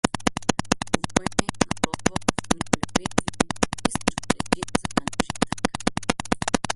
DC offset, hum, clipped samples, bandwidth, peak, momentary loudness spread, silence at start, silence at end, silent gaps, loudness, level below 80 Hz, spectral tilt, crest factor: under 0.1%; none; under 0.1%; 12 kHz; -2 dBFS; 3 LU; 0.05 s; 0 s; none; -25 LUFS; -44 dBFS; -3.5 dB/octave; 24 dB